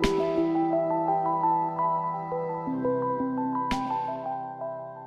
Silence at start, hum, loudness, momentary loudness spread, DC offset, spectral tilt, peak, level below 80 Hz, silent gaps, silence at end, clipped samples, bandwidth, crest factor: 0 s; none; -28 LUFS; 8 LU; under 0.1%; -6.5 dB/octave; -10 dBFS; -48 dBFS; none; 0 s; under 0.1%; 12.5 kHz; 18 dB